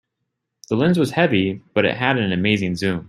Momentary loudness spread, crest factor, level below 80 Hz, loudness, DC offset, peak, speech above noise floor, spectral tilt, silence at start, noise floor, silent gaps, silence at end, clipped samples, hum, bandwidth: 4 LU; 18 dB; -56 dBFS; -19 LUFS; under 0.1%; -2 dBFS; 59 dB; -6.5 dB/octave; 0.7 s; -78 dBFS; none; 0.05 s; under 0.1%; none; 13.5 kHz